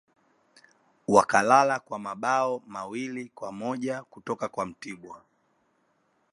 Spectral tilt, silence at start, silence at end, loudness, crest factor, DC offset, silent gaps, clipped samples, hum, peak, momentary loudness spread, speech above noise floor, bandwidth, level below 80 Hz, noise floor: -4.5 dB/octave; 1.1 s; 1.15 s; -26 LUFS; 26 dB; under 0.1%; none; under 0.1%; none; -2 dBFS; 19 LU; 44 dB; 11.5 kHz; -70 dBFS; -70 dBFS